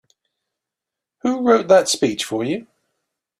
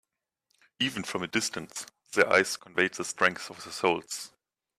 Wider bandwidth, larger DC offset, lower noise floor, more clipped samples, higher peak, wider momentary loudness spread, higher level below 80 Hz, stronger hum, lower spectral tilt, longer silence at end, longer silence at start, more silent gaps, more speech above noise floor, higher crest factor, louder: about the same, 14.5 kHz vs 15.5 kHz; neither; first, -86 dBFS vs -79 dBFS; neither; first, -2 dBFS vs -8 dBFS; second, 12 LU vs 16 LU; first, -64 dBFS vs -72 dBFS; neither; about the same, -3.5 dB/octave vs -2.5 dB/octave; first, 0.75 s vs 0.5 s; first, 1.25 s vs 0.8 s; neither; first, 68 dB vs 50 dB; about the same, 20 dB vs 24 dB; first, -18 LUFS vs -28 LUFS